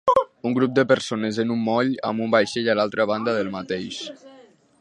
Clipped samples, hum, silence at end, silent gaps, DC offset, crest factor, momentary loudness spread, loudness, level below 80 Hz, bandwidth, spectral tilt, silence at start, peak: under 0.1%; none; 0.4 s; none; under 0.1%; 18 dB; 9 LU; -22 LUFS; -62 dBFS; 11 kHz; -5.5 dB/octave; 0.05 s; -4 dBFS